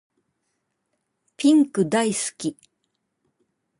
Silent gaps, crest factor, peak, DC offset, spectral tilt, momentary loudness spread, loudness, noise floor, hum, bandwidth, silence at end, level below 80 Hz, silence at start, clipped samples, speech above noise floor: none; 18 dB; -8 dBFS; under 0.1%; -4.5 dB/octave; 13 LU; -21 LUFS; -76 dBFS; none; 11.5 kHz; 1.3 s; -70 dBFS; 1.4 s; under 0.1%; 55 dB